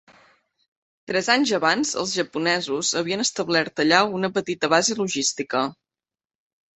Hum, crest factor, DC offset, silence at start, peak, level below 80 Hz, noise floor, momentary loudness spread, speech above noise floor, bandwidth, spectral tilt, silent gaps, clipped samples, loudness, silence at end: none; 22 dB; under 0.1%; 1.1 s; -2 dBFS; -66 dBFS; under -90 dBFS; 6 LU; over 68 dB; 8.6 kHz; -2.5 dB/octave; none; under 0.1%; -22 LUFS; 1 s